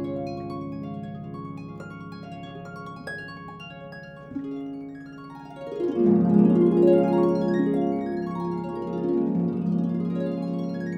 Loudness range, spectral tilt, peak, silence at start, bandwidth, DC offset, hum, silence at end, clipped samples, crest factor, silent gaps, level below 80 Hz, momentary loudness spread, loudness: 16 LU; -9.5 dB/octave; -6 dBFS; 0 s; 6 kHz; under 0.1%; none; 0 s; under 0.1%; 18 dB; none; -58 dBFS; 20 LU; -24 LUFS